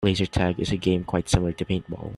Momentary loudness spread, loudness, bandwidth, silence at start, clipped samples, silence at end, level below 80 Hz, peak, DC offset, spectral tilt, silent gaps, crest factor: 5 LU; -25 LUFS; 12.5 kHz; 0 s; under 0.1%; 0 s; -40 dBFS; -4 dBFS; under 0.1%; -6 dB/octave; none; 20 dB